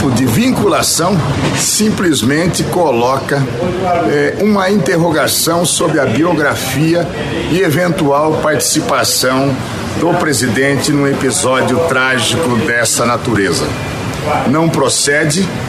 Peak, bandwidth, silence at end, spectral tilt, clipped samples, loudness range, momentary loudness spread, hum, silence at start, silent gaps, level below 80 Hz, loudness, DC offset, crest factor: -2 dBFS; 14.5 kHz; 0 s; -4 dB/octave; under 0.1%; 1 LU; 4 LU; none; 0 s; none; -38 dBFS; -12 LUFS; under 0.1%; 10 dB